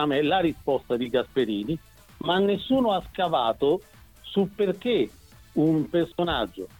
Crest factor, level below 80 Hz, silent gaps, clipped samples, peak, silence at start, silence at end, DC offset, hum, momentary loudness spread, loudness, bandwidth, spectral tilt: 16 dB; -52 dBFS; none; under 0.1%; -10 dBFS; 0 s; 0.15 s; under 0.1%; none; 7 LU; -26 LUFS; 18.5 kHz; -7 dB/octave